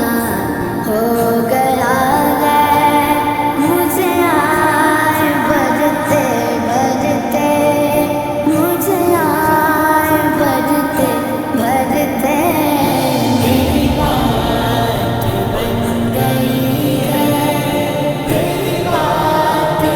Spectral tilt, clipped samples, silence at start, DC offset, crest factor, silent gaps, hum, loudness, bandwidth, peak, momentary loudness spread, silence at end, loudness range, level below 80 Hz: -5.5 dB/octave; under 0.1%; 0 s; under 0.1%; 14 dB; none; none; -14 LUFS; over 20 kHz; 0 dBFS; 4 LU; 0 s; 3 LU; -36 dBFS